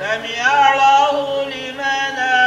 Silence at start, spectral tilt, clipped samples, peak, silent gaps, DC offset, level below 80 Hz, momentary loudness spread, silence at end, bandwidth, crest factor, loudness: 0 s; -1.5 dB/octave; under 0.1%; -2 dBFS; none; under 0.1%; -58 dBFS; 10 LU; 0 s; 10.5 kHz; 14 dB; -15 LUFS